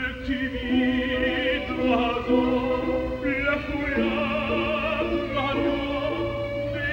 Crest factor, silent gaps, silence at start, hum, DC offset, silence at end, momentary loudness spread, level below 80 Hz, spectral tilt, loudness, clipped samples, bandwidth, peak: 16 dB; none; 0 s; none; under 0.1%; 0 s; 5 LU; -40 dBFS; -7 dB/octave; -25 LUFS; under 0.1%; 16 kHz; -10 dBFS